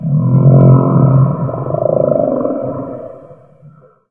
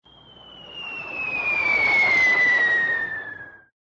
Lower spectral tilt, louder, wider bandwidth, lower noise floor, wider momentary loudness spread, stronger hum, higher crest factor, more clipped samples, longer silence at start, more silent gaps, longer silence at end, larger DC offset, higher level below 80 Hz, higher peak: first, -15 dB/octave vs -2.5 dB/octave; first, -11 LUFS vs -18 LUFS; second, 2.3 kHz vs 8 kHz; second, -42 dBFS vs -48 dBFS; about the same, 17 LU vs 19 LU; neither; about the same, 12 dB vs 12 dB; neither; second, 0 s vs 0.45 s; neither; about the same, 0.4 s vs 0.3 s; neither; first, -42 dBFS vs -58 dBFS; first, 0 dBFS vs -12 dBFS